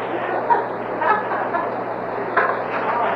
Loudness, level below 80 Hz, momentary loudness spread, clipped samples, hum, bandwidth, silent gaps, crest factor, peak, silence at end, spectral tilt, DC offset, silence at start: -21 LUFS; -66 dBFS; 6 LU; under 0.1%; none; 6 kHz; none; 18 dB; -4 dBFS; 0 s; -7.5 dB/octave; under 0.1%; 0 s